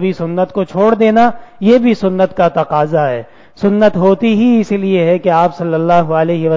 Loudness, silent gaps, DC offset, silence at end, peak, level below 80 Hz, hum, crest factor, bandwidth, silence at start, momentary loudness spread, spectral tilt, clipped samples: -12 LUFS; none; under 0.1%; 0 s; 0 dBFS; -50 dBFS; none; 12 dB; 7.6 kHz; 0 s; 6 LU; -8 dB/octave; under 0.1%